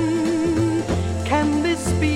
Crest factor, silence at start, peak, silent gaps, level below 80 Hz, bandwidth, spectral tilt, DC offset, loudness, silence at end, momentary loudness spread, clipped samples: 14 dB; 0 s; -6 dBFS; none; -36 dBFS; 13.5 kHz; -6 dB/octave; under 0.1%; -21 LUFS; 0 s; 3 LU; under 0.1%